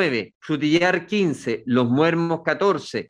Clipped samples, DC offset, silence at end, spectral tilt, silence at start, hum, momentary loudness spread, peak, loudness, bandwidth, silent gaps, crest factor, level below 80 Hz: under 0.1%; under 0.1%; 0.05 s; -6 dB/octave; 0 s; none; 7 LU; -4 dBFS; -21 LUFS; 10.5 kHz; 0.35-0.41 s; 16 dB; -64 dBFS